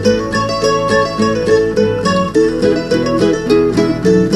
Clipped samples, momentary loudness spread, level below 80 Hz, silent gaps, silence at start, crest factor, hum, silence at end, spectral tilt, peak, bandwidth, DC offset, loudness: under 0.1%; 3 LU; -36 dBFS; none; 0 s; 12 dB; none; 0 s; -6 dB/octave; 0 dBFS; 12.5 kHz; under 0.1%; -13 LUFS